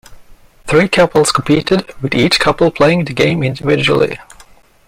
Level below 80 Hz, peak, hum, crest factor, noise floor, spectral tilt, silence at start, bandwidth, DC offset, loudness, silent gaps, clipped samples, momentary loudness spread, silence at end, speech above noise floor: -40 dBFS; 0 dBFS; none; 14 dB; -43 dBFS; -5 dB/octave; 0.1 s; 16.5 kHz; under 0.1%; -13 LUFS; none; under 0.1%; 6 LU; 0.65 s; 31 dB